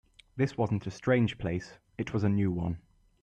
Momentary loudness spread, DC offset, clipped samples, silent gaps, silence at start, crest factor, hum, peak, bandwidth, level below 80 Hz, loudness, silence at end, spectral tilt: 13 LU; under 0.1%; under 0.1%; none; 0.35 s; 16 dB; none; -14 dBFS; 9 kHz; -56 dBFS; -31 LUFS; 0.45 s; -8 dB/octave